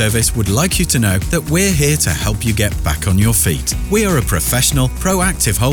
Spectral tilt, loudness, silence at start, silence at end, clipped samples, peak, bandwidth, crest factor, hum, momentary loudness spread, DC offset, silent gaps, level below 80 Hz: -4 dB/octave; -14 LUFS; 0 s; 0 s; under 0.1%; -4 dBFS; over 20 kHz; 10 dB; none; 4 LU; under 0.1%; none; -24 dBFS